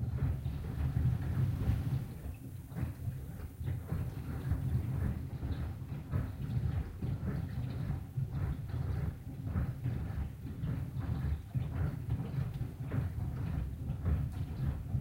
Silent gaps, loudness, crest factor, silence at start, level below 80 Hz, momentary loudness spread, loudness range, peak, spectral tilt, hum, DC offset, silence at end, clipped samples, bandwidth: none; -38 LUFS; 16 dB; 0 s; -42 dBFS; 7 LU; 2 LU; -20 dBFS; -8.5 dB/octave; none; under 0.1%; 0 s; under 0.1%; 16 kHz